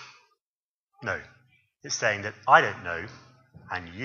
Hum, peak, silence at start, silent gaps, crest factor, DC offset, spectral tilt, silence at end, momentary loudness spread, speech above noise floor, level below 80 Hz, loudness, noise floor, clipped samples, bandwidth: none; -2 dBFS; 0 s; 0.41-0.87 s; 26 dB; under 0.1%; -3 dB/octave; 0 s; 17 LU; over 63 dB; -64 dBFS; -26 LUFS; under -90 dBFS; under 0.1%; 7.4 kHz